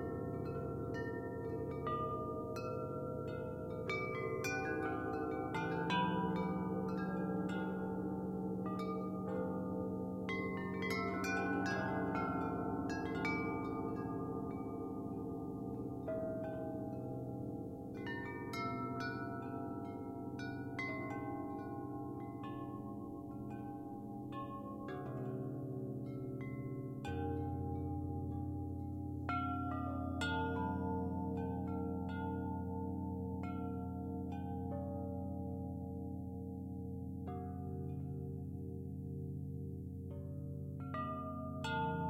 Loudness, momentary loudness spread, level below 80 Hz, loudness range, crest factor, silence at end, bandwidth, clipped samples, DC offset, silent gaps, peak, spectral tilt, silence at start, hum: -42 LUFS; 8 LU; -60 dBFS; 6 LU; 16 dB; 0 s; 16 kHz; under 0.1%; under 0.1%; none; -24 dBFS; -7.5 dB/octave; 0 s; none